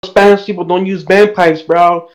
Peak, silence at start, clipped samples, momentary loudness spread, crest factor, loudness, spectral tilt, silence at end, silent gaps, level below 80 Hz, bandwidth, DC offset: 0 dBFS; 0.05 s; 0.4%; 7 LU; 10 dB; -10 LUFS; -6 dB/octave; 0.1 s; none; -46 dBFS; 12 kHz; under 0.1%